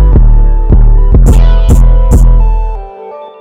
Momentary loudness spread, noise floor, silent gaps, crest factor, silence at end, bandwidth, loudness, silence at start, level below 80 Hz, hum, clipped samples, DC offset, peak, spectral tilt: 16 LU; -26 dBFS; none; 4 dB; 0.15 s; 8.8 kHz; -8 LUFS; 0 s; -4 dBFS; none; under 0.1%; under 0.1%; 0 dBFS; -8 dB/octave